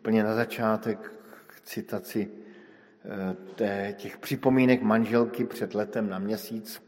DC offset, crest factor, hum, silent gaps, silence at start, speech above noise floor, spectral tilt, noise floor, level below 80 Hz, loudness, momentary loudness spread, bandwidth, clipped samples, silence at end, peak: under 0.1%; 22 dB; none; none; 0.05 s; 26 dB; -6.5 dB/octave; -53 dBFS; -70 dBFS; -28 LUFS; 16 LU; 16.5 kHz; under 0.1%; 0.1 s; -6 dBFS